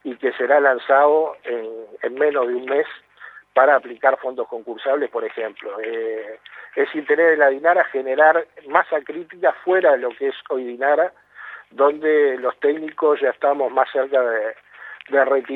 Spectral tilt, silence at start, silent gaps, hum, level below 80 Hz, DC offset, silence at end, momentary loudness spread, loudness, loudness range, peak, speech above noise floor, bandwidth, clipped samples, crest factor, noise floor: -6 dB/octave; 0.05 s; none; 50 Hz at -75 dBFS; -78 dBFS; under 0.1%; 0 s; 14 LU; -19 LUFS; 3 LU; 0 dBFS; 25 dB; 4.2 kHz; under 0.1%; 18 dB; -44 dBFS